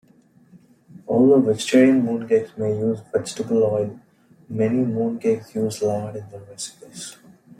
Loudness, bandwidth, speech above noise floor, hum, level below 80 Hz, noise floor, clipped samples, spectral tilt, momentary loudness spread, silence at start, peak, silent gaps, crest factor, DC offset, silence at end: -20 LUFS; 13.5 kHz; 34 dB; none; -66 dBFS; -55 dBFS; under 0.1%; -6 dB/octave; 20 LU; 1.1 s; -4 dBFS; none; 16 dB; under 0.1%; 0.45 s